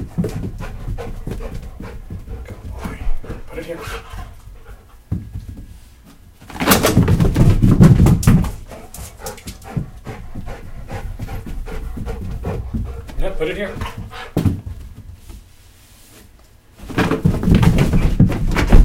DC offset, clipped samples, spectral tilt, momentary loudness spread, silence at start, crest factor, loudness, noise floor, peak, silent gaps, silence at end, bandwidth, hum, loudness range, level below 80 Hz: under 0.1%; under 0.1%; -6.5 dB/octave; 21 LU; 0 s; 18 dB; -18 LUFS; -46 dBFS; 0 dBFS; none; 0 s; 17 kHz; none; 17 LU; -24 dBFS